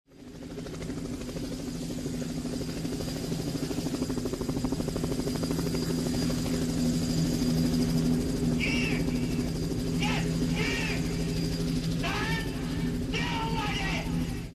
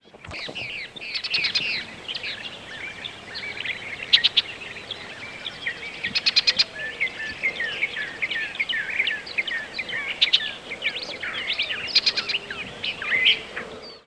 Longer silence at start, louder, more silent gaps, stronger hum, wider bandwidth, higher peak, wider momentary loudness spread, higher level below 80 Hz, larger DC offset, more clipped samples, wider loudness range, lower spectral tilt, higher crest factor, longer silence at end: about the same, 0.1 s vs 0.15 s; second, -30 LUFS vs -24 LUFS; neither; neither; first, 13 kHz vs 11 kHz; second, -16 dBFS vs -2 dBFS; second, 9 LU vs 15 LU; first, -40 dBFS vs -60 dBFS; neither; neither; about the same, 6 LU vs 5 LU; first, -5.5 dB/octave vs -1 dB/octave; second, 14 dB vs 26 dB; about the same, 0 s vs 0.05 s